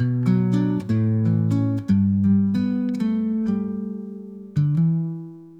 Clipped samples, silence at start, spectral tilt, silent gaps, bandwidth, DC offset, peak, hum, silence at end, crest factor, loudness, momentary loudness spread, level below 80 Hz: under 0.1%; 0 s; -10 dB/octave; none; 7.6 kHz; under 0.1%; -8 dBFS; none; 0 s; 12 dB; -22 LUFS; 11 LU; -56 dBFS